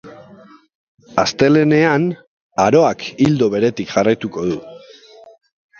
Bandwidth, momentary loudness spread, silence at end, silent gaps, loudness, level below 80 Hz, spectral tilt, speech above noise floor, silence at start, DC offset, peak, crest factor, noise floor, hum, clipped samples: 7.4 kHz; 10 LU; 1 s; 0.75-0.95 s, 2.27-2.50 s; -16 LUFS; -52 dBFS; -6 dB/octave; 29 dB; 0.05 s; under 0.1%; 0 dBFS; 18 dB; -44 dBFS; none; under 0.1%